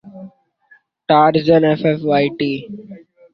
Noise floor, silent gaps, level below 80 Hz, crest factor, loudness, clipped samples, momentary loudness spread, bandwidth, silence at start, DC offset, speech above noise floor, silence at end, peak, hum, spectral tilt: -53 dBFS; none; -56 dBFS; 16 dB; -15 LUFS; under 0.1%; 21 LU; 6 kHz; 0.05 s; under 0.1%; 39 dB; 0.35 s; -2 dBFS; none; -9 dB/octave